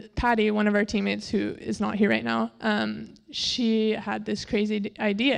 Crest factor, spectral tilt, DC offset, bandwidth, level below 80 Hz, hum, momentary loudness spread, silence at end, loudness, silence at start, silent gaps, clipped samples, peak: 16 dB; -5 dB/octave; under 0.1%; 10 kHz; -48 dBFS; none; 7 LU; 0 s; -26 LUFS; 0 s; none; under 0.1%; -10 dBFS